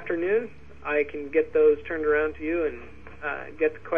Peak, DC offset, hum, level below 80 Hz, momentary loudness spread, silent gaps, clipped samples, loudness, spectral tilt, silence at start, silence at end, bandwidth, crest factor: -10 dBFS; 0.6%; none; -52 dBFS; 15 LU; none; under 0.1%; -26 LUFS; -8 dB/octave; 0 s; 0 s; 3.7 kHz; 16 dB